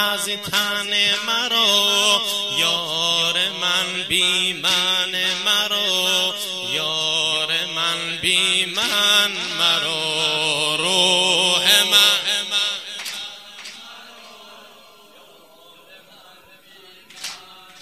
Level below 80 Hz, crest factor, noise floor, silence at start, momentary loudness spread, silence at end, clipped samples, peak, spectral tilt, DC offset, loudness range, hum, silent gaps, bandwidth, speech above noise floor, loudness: -64 dBFS; 20 dB; -48 dBFS; 0 s; 14 LU; 0 s; under 0.1%; 0 dBFS; -0.5 dB/octave; 0.1%; 4 LU; none; none; 15.5 kHz; 28 dB; -17 LUFS